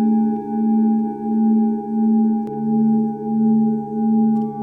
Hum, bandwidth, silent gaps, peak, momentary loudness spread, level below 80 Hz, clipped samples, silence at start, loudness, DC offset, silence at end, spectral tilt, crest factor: none; 1.8 kHz; none; -8 dBFS; 4 LU; -60 dBFS; under 0.1%; 0 s; -18 LUFS; under 0.1%; 0 s; -12.5 dB/octave; 8 dB